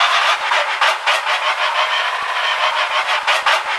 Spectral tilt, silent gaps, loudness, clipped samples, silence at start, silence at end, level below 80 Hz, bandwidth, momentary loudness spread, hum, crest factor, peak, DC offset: 2.5 dB/octave; none; -16 LUFS; under 0.1%; 0 s; 0 s; -70 dBFS; 12 kHz; 3 LU; none; 16 dB; -2 dBFS; under 0.1%